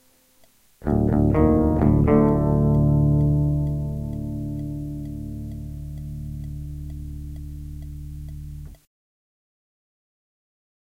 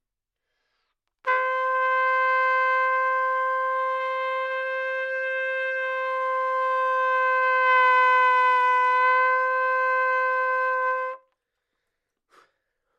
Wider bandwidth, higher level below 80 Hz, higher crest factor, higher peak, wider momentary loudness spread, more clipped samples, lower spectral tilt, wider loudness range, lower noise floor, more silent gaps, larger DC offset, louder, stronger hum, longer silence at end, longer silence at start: second, 2.9 kHz vs 7.6 kHz; first, -32 dBFS vs -88 dBFS; about the same, 18 dB vs 16 dB; first, -4 dBFS vs -8 dBFS; first, 18 LU vs 8 LU; neither; first, -11 dB/octave vs 1.5 dB/octave; first, 20 LU vs 6 LU; second, -57 dBFS vs -84 dBFS; neither; neither; about the same, -22 LUFS vs -22 LUFS; neither; first, 2.1 s vs 1.8 s; second, 0.8 s vs 1.25 s